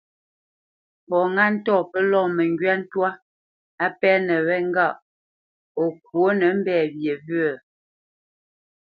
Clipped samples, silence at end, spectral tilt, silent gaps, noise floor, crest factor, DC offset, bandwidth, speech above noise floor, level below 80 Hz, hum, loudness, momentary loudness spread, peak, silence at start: under 0.1%; 1.45 s; -9 dB/octave; 3.22-3.78 s, 5.02-5.75 s; under -90 dBFS; 20 dB; under 0.1%; 5.2 kHz; over 69 dB; -74 dBFS; none; -21 LUFS; 7 LU; -4 dBFS; 1.1 s